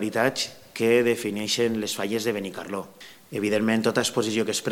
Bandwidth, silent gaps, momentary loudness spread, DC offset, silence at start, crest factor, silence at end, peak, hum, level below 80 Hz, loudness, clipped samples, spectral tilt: 18 kHz; none; 12 LU; under 0.1%; 0 s; 20 dB; 0 s; -6 dBFS; none; -68 dBFS; -25 LUFS; under 0.1%; -3.5 dB/octave